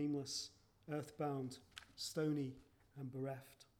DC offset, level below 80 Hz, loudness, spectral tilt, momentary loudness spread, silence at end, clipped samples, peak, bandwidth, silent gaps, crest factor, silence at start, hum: under 0.1%; -78 dBFS; -45 LUFS; -5 dB/octave; 16 LU; 0.15 s; under 0.1%; -30 dBFS; 17.5 kHz; none; 16 dB; 0 s; none